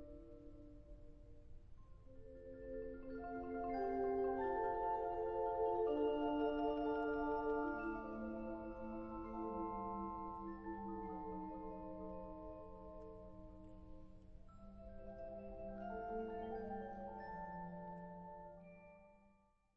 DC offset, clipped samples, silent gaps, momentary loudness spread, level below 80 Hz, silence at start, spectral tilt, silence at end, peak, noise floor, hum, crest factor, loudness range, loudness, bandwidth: under 0.1%; under 0.1%; none; 22 LU; -60 dBFS; 0 s; -6 dB/octave; 0.4 s; -28 dBFS; -74 dBFS; none; 16 dB; 15 LU; -44 LUFS; 5.8 kHz